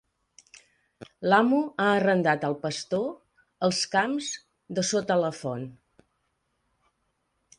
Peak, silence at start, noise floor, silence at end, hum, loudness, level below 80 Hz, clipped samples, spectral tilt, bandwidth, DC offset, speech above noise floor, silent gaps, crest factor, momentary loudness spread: -8 dBFS; 1 s; -75 dBFS; 1.85 s; none; -26 LUFS; -70 dBFS; under 0.1%; -4.5 dB/octave; 11 kHz; under 0.1%; 50 dB; none; 22 dB; 12 LU